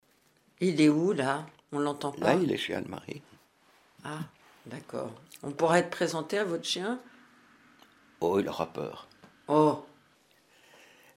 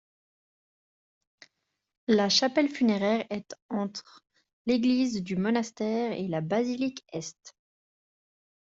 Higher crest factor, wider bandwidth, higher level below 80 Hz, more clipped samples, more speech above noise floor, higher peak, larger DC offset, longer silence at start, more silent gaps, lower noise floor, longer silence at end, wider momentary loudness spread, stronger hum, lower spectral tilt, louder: about the same, 22 dB vs 18 dB; first, 15.5 kHz vs 7.8 kHz; about the same, -72 dBFS vs -70 dBFS; neither; second, 38 dB vs 51 dB; about the same, -10 dBFS vs -12 dBFS; neither; second, 0.6 s vs 2.1 s; second, none vs 3.62-3.69 s, 4.53-4.65 s; second, -67 dBFS vs -78 dBFS; first, 1.3 s vs 1.1 s; first, 18 LU vs 15 LU; neither; about the same, -5.5 dB/octave vs -4.5 dB/octave; about the same, -30 LUFS vs -28 LUFS